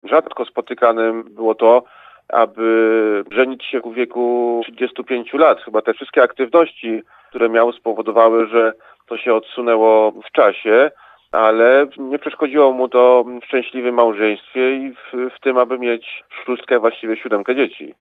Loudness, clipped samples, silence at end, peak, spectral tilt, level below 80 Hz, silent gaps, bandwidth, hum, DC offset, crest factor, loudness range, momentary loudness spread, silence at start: -16 LUFS; under 0.1%; 0.1 s; 0 dBFS; -6.5 dB/octave; -72 dBFS; none; 4.6 kHz; none; under 0.1%; 16 dB; 4 LU; 12 LU; 0.05 s